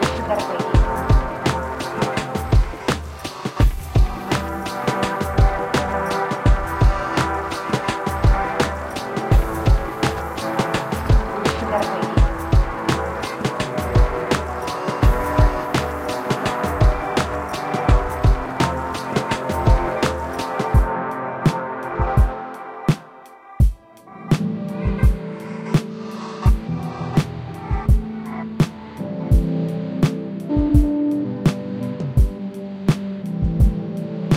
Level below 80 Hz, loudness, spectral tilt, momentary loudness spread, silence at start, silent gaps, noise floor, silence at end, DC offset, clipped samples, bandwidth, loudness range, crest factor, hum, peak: -24 dBFS; -21 LUFS; -6.5 dB/octave; 8 LU; 0 s; none; -42 dBFS; 0 s; under 0.1%; under 0.1%; 15.5 kHz; 3 LU; 16 dB; none; -4 dBFS